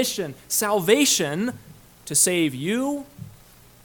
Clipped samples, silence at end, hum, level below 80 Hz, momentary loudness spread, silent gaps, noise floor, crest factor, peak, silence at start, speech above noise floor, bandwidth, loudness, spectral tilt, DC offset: under 0.1%; 0.55 s; none; -60 dBFS; 16 LU; none; -50 dBFS; 20 dB; -4 dBFS; 0 s; 28 dB; 19 kHz; -21 LUFS; -2.5 dB/octave; under 0.1%